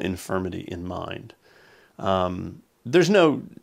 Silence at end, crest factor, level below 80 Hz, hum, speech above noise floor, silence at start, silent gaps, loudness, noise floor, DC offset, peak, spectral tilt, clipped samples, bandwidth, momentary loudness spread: 0.1 s; 20 dB; -56 dBFS; none; 31 dB; 0 s; none; -24 LUFS; -55 dBFS; under 0.1%; -6 dBFS; -5.5 dB/octave; under 0.1%; 15.5 kHz; 18 LU